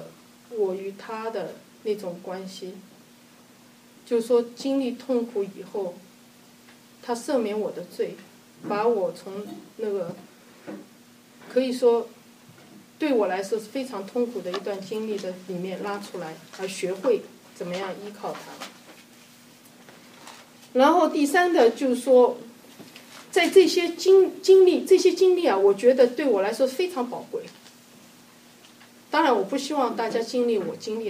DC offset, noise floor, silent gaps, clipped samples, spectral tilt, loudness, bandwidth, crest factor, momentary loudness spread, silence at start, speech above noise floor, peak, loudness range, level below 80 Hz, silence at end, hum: under 0.1%; -53 dBFS; none; under 0.1%; -4.5 dB/octave; -24 LUFS; 15.5 kHz; 20 dB; 20 LU; 0 s; 29 dB; -4 dBFS; 12 LU; -82 dBFS; 0 s; none